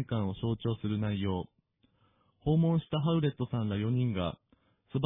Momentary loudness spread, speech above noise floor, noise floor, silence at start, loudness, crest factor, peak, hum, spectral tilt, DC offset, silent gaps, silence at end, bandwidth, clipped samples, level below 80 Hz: 10 LU; 40 dB; -70 dBFS; 0 s; -32 LUFS; 16 dB; -16 dBFS; none; -11.5 dB/octave; under 0.1%; none; 0 s; 3.9 kHz; under 0.1%; -56 dBFS